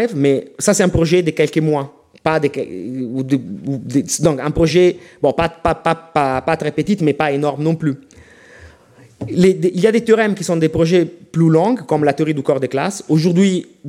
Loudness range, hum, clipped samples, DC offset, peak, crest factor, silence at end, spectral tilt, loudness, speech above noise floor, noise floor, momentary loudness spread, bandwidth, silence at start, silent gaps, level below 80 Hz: 4 LU; none; under 0.1%; under 0.1%; -2 dBFS; 16 dB; 0 s; -6 dB/octave; -16 LUFS; 31 dB; -46 dBFS; 9 LU; 15 kHz; 0 s; none; -42 dBFS